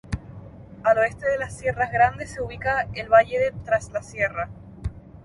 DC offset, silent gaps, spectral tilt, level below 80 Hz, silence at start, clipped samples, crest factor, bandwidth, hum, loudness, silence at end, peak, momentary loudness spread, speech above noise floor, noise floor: under 0.1%; none; -5.5 dB/octave; -44 dBFS; 0.05 s; under 0.1%; 20 dB; 11.5 kHz; none; -23 LUFS; 0.05 s; -4 dBFS; 17 LU; 19 dB; -42 dBFS